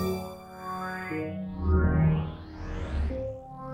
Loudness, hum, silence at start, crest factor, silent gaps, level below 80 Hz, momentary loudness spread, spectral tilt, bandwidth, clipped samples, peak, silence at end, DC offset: -30 LUFS; none; 0 s; 16 dB; none; -34 dBFS; 16 LU; -8 dB/octave; 16 kHz; under 0.1%; -12 dBFS; 0 s; under 0.1%